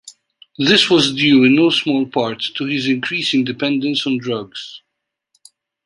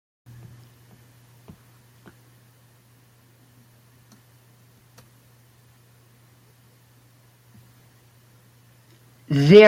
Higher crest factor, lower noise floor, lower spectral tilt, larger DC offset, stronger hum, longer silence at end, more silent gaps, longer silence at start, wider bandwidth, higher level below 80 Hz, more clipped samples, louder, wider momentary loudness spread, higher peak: second, 18 dB vs 24 dB; first, -78 dBFS vs -56 dBFS; second, -4.5 dB/octave vs -7 dB/octave; neither; neither; first, 1.05 s vs 0 s; neither; second, 0.05 s vs 9.3 s; second, 11.5 kHz vs 13.5 kHz; first, -60 dBFS vs -66 dBFS; neither; about the same, -15 LUFS vs -17 LUFS; second, 12 LU vs 30 LU; about the same, 0 dBFS vs 0 dBFS